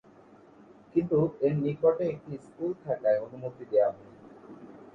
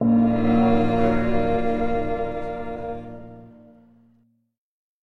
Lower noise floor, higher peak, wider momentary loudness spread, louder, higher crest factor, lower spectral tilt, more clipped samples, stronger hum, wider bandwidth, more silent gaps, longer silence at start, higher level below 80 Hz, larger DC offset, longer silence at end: second, -55 dBFS vs -62 dBFS; second, -12 dBFS vs -8 dBFS; first, 22 LU vs 16 LU; second, -29 LUFS vs -22 LUFS; about the same, 18 dB vs 16 dB; first, -10.5 dB/octave vs -9 dB/octave; neither; neither; second, 4.8 kHz vs 5.8 kHz; neither; first, 0.95 s vs 0 s; second, -66 dBFS vs -40 dBFS; neither; second, 0.1 s vs 1.55 s